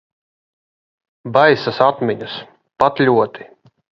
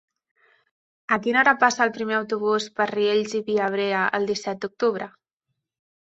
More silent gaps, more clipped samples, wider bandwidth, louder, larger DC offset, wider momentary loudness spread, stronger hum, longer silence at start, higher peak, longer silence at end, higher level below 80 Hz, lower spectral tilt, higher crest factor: neither; neither; second, 7.4 kHz vs 8.2 kHz; first, -16 LUFS vs -22 LUFS; neither; first, 15 LU vs 9 LU; neither; first, 1.25 s vs 1.1 s; about the same, 0 dBFS vs -2 dBFS; second, 0.55 s vs 1.05 s; first, -60 dBFS vs -70 dBFS; first, -7 dB/octave vs -4 dB/octave; about the same, 18 dB vs 22 dB